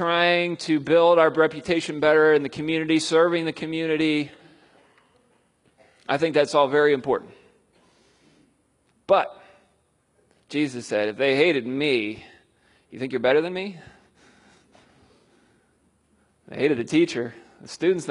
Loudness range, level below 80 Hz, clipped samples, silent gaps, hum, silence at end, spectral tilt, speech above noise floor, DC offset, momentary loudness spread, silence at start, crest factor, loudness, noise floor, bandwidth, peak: 9 LU; -66 dBFS; under 0.1%; none; none; 0 s; -5 dB/octave; 45 dB; under 0.1%; 14 LU; 0 s; 20 dB; -22 LUFS; -66 dBFS; 11 kHz; -4 dBFS